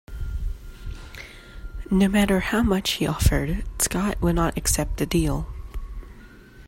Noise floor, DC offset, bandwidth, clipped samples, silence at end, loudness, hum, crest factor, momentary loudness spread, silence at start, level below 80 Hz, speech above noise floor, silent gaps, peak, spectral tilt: -45 dBFS; under 0.1%; 16.5 kHz; under 0.1%; 0 s; -23 LUFS; none; 20 dB; 19 LU; 0.1 s; -30 dBFS; 23 dB; none; -4 dBFS; -4.5 dB/octave